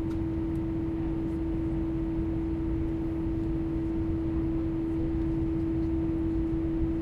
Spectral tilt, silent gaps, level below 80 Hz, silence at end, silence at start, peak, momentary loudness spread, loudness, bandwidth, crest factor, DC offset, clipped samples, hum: -10.5 dB/octave; none; -36 dBFS; 0 s; 0 s; -18 dBFS; 2 LU; -30 LUFS; 4.8 kHz; 12 dB; under 0.1%; under 0.1%; none